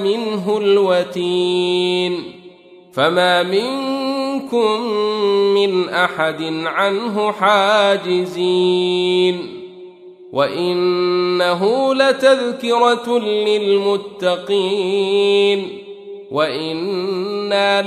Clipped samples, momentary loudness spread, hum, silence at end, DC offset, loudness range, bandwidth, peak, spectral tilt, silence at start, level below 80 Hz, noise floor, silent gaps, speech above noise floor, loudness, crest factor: under 0.1%; 8 LU; none; 0 s; under 0.1%; 2 LU; 12.5 kHz; -2 dBFS; -5 dB/octave; 0 s; -68 dBFS; -42 dBFS; none; 26 dB; -17 LUFS; 16 dB